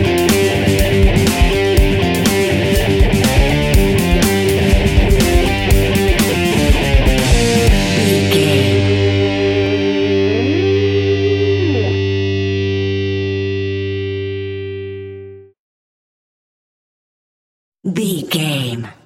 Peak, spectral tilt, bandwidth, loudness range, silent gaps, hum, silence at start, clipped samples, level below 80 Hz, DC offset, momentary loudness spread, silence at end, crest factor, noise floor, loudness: 0 dBFS; -5.5 dB/octave; 17 kHz; 12 LU; 15.59-17.72 s; none; 0 s; under 0.1%; -20 dBFS; under 0.1%; 8 LU; 0.15 s; 14 dB; -34 dBFS; -14 LUFS